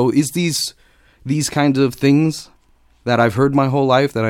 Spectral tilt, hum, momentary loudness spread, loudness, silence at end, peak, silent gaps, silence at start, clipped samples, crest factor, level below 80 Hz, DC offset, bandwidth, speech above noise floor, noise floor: -5.5 dB/octave; none; 10 LU; -17 LUFS; 0 s; -2 dBFS; none; 0 s; under 0.1%; 14 dB; -50 dBFS; under 0.1%; 16.5 kHz; 38 dB; -54 dBFS